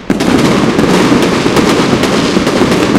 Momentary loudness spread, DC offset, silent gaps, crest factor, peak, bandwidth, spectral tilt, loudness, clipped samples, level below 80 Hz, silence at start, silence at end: 2 LU; 0.2%; none; 10 dB; 0 dBFS; 16.5 kHz; -5 dB/octave; -9 LUFS; 0.7%; -32 dBFS; 0 s; 0 s